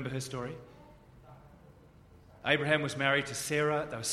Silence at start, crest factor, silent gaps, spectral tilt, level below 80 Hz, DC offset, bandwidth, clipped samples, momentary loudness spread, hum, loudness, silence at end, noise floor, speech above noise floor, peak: 0 s; 24 dB; none; -3.5 dB/octave; -62 dBFS; under 0.1%; 15 kHz; under 0.1%; 12 LU; none; -31 LUFS; 0 s; -57 dBFS; 26 dB; -10 dBFS